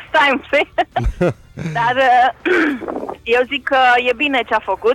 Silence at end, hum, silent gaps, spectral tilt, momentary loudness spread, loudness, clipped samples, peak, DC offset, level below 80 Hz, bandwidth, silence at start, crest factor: 0 s; none; none; -5.5 dB/octave; 10 LU; -16 LUFS; under 0.1%; -6 dBFS; under 0.1%; -34 dBFS; 13 kHz; 0 s; 10 dB